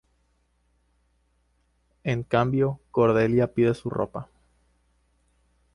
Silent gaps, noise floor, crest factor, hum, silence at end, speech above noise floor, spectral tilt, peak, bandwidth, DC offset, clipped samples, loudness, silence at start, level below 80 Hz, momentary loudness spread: none; -68 dBFS; 20 dB; 60 Hz at -45 dBFS; 1.5 s; 45 dB; -8.5 dB/octave; -8 dBFS; 11 kHz; under 0.1%; under 0.1%; -24 LUFS; 2.05 s; -56 dBFS; 11 LU